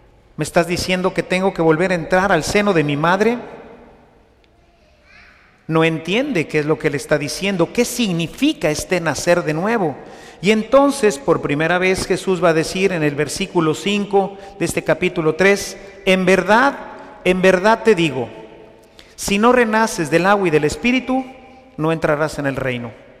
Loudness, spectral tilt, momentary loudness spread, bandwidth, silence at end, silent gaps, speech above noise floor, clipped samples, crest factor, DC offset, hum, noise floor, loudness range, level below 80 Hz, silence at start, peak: -17 LUFS; -5 dB/octave; 9 LU; 15.5 kHz; 0.25 s; none; 36 dB; under 0.1%; 16 dB; under 0.1%; none; -53 dBFS; 4 LU; -44 dBFS; 0.4 s; -2 dBFS